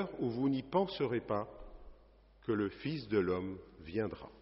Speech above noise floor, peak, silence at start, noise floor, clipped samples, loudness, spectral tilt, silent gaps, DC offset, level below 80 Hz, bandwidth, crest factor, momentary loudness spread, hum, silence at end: 26 dB; -18 dBFS; 0 s; -62 dBFS; under 0.1%; -36 LUFS; -6 dB/octave; none; under 0.1%; -60 dBFS; 5.8 kHz; 18 dB; 12 LU; none; 0 s